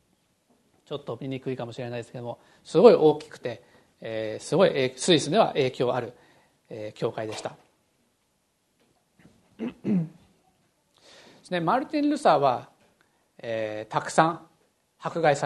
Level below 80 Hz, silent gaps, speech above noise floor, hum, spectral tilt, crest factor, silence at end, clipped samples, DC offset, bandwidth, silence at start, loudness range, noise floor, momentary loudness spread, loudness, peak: -70 dBFS; none; 47 dB; none; -5 dB/octave; 26 dB; 0 s; under 0.1%; under 0.1%; 12 kHz; 0.9 s; 13 LU; -72 dBFS; 18 LU; -25 LUFS; -2 dBFS